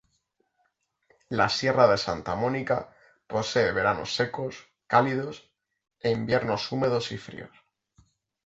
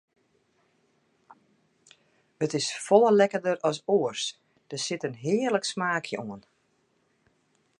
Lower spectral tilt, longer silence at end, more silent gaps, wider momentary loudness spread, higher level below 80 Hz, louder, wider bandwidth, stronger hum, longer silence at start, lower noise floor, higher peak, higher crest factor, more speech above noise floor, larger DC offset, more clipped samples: about the same, -5 dB/octave vs -4 dB/octave; second, 1 s vs 1.4 s; neither; about the same, 16 LU vs 14 LU; first, -58 dBFS vs -78 dBFS; about the same, -26 LUFS vs -26 LUFS; second, 8 kHz vs 11.5 kHz; neither; second, 1.3 s vs 2.4 s; first, -74 dBFS vs -70 dBFS; about the same, -6 dBFS vs -6 dBFS; about the same, 22 dB vs 24 dB; about the same, 48 dB vs 45 dB; neither; neither